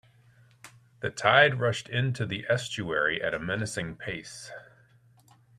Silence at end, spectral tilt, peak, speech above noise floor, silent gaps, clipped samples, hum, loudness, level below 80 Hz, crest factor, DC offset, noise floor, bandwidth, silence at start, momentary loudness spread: 0.95 s; -4.5 dB/octave; -6 dBFS; 32 dB; none; under 0.1%; none; -27 LUFS; -62 dBFS; 24 dB; under 0.1%; -60 dBFS; 13 kHz; 0.65 s; 18 LU